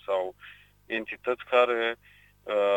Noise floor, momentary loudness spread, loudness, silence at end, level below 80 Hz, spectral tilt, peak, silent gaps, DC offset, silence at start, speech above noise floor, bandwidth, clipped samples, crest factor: -52 dBFS; 22 LU; -28 LUFS; 0 s; -66 dBFS; -4.5 dB/octave; -10 dBFS; none; under 0.1%; 0.1 s; 26 dB; 16.5 kHz; under 0.1%; 20 dB